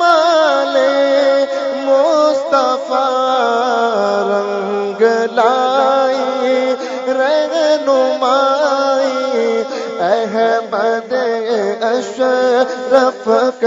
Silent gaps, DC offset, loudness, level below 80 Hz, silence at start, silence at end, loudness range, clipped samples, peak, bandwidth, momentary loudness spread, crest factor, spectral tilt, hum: none; under 0.1%; -14 LUFS; -70 dBFS; 0 s; 0 s; 2 LU; under 0.1%; 0 dBFS; 7.8 kHz; 5 LU; 14 dB; -3.5 dB/octave; none